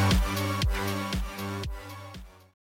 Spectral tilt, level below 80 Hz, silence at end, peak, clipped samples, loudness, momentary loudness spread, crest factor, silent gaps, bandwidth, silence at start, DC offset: -5 dB/octave; -34 dBFS; 0.45 s; -16 dBFS; under 0.1%; -30 LUFS; 17 LU; 14 dB; none; 17 kHz; 0 s; under 0.1%